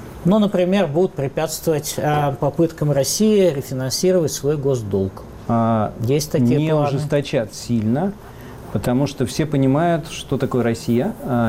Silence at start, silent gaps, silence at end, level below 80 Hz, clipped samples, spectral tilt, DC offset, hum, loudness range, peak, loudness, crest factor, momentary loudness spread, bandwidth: 0 s; none; 0 s; -44 dBFS; under 0.1%; -6 dB/octave; 0.1%; none; 2 LU; -8 dBFS; -19 LUFS; 12 dB; 7 LU; 16 kHz